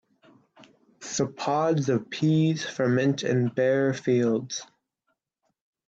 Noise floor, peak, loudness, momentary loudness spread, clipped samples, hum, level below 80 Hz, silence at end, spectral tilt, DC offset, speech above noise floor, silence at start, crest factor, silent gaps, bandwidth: -78 dBFS; -12 dBFS; -25 LUFS; 7 LU; under 0.1%; none; -70 dBFS; 1.25 s; -6 dB/octave; under 0.1%; 54 dB; 1 s; 14 dB; none; 8 kHz